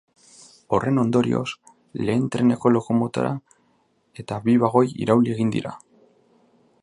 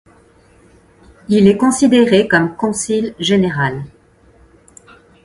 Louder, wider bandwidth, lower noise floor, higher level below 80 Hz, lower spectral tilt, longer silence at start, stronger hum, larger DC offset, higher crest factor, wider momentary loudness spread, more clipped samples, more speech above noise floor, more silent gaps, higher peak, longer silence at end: second, -22 LUFS vs -14 LUFS; about the same, 11 kHz vs 11.5 kHz; first, -65 dBFS vs -49 dBFS; second, -58 dBFS vs -50 dBFS; first, -7.5 dB/octave vs -5 dB/octave; second, 0.7 s vs 1.3 s; neither; neither; about the same, 20 dB vs 16 dB; first, 14 LU vs 8 LU; neither; first, 44 dB vs 35 dB; neither; about the same, -2 dBFS vs 0 dBFS; second, 1.05 s vs 1.35 s